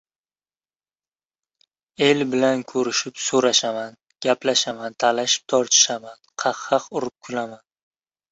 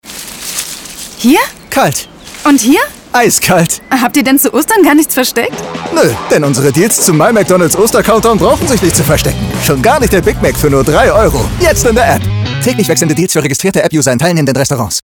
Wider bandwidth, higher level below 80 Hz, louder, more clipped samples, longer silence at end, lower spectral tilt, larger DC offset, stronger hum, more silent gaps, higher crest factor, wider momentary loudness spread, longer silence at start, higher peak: second, 8.4 kHz vs over 20 kHz; second, -68 dBFS vs -26 dBFS; second, -21 LUFS vs -9 LUFS; neither; first, 0.75 s vs 0.05 s; second, -2 dB/octave vs -4.5 dB/octave; neither; neither; neither; first, 22 dB vs 10 dB; first, 13 LU vs 7 LU; first, 2 s vs 0.05 s; about the same, -2 dBFS vs 0 dBFS